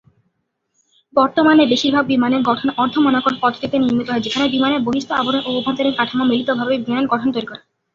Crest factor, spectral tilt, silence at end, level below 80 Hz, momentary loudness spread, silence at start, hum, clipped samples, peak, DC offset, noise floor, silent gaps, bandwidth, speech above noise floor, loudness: 16 dB; -5 dB/octave; 0.35 s; -56 dBFS; 6 LU; 1.15 s; none; under 0.1%; -2 dBFS; under 0.1%; -70 dBFS; none; 7.4 kHz; 54 dB; -17 LUFS